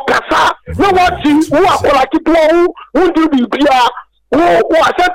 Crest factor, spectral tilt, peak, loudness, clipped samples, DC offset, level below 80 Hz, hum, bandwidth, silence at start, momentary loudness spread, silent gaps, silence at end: 6 dB; -4.5 dB/octave; -6 dBFS; -11 LUFS; under 0.1%; under 0.1%; -34 dBFS; none; 16 kHz; 0 s; 4 LU; none; 0 s